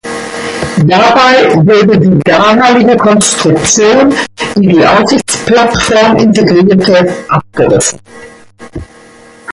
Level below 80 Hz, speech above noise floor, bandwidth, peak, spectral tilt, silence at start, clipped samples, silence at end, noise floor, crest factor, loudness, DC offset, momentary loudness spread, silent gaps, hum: -36 dBFS; 30 dB; 11.5 kHz; 0 dBFS; -4.5 dB/octave; 0.05 s; under 0.1%; 0 s; -36 dBFS; 8 dB; -7 LUFS; under 0.1%; 10 LU; none; none